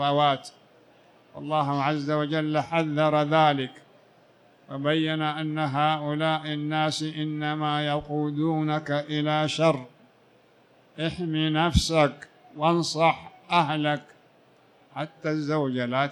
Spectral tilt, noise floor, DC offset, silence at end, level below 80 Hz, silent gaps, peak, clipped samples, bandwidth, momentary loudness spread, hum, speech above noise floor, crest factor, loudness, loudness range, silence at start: -5.5 dB/octave; -59 dBFS; under 0.1%; 0 s; -48 dBFS; none; -6 dBFS; under 0.1%; 12 kHz; 10 LU; none; 34 dB; 20 dB; -26 LUFS; 3 LU; 0 s